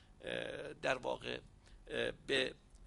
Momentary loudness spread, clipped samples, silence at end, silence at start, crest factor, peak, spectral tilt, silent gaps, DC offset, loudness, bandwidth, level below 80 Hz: 9 LU; under 0.1%; 0 s; 0 s; 24 dB; -18 dBFS; -3.5 dB/octave; none; under 0.1%; -40 LUFS; 11.5 kHz; -62 dBFS